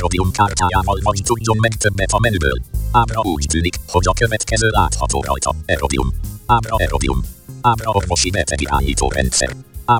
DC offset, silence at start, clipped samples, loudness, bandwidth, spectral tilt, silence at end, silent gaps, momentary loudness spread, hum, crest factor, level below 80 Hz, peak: under 0.1%; 0 s; under 0.1%; -17 LUFS; 17 kHz; -4 dB/octave; 0 s; none; 4 LU; none; 16 dB; -24 dBFS; 0 dBFS